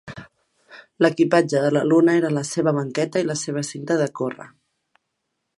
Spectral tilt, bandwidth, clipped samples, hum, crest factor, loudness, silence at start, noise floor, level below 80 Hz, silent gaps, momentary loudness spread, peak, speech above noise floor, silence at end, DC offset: -5.5 dB/octave; 11.5 kHz; under 0.1%; none; 20 dB; -21 LUFS; 0.05 s; -77 dBFS; -68 dBFS; none; 12 LU; -2 dBFS; 57 dB; 1.1 s; under 0.1%